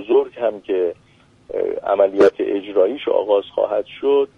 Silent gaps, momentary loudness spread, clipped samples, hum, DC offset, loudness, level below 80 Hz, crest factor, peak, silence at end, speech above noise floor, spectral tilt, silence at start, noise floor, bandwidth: none; 8 LU; under 0.1%; none; under 0.1%; -19 LUFS; -60 dBFS; 16 dB; -2 dBFS; 0.1 s; 23 dB; -6 dB/octave; 0 s; -41 dBFS; 6.8 kHz